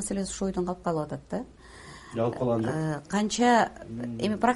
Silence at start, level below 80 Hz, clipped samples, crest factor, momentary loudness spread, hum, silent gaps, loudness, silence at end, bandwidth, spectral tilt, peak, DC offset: 0 s; -52 dBFS; under 0.1%; 18 dB; 15 LU; none; none; -28 LUFS; 0 s; 11.5 kHz; -5 dB/octave; -10 dBFS; under 0.1%